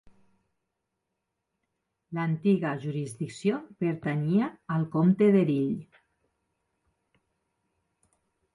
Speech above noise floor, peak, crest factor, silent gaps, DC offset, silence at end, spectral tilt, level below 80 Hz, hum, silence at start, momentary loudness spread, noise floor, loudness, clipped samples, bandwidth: 57 dB; -12 dBFS; 18 dB; none; under 0.1%; 2.7 s; -8.5 dB/octave; -70 dBFS; none; 2.1 s; 12 LU; -83 dBFS; -27 LUFS; under 0.1%; 11.5 kHz